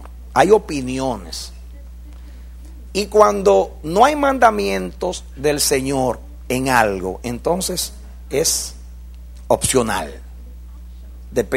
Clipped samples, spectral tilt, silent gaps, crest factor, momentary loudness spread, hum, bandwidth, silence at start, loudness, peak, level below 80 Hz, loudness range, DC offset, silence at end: under 0.1%; -3.5 dB/octave; none; 20 dB; 25 LU; none; 16 kHz; 0 s; -18 LUFS; 0 dBFS; -36 dBFS; 5 LU; under 0.1%; 0 s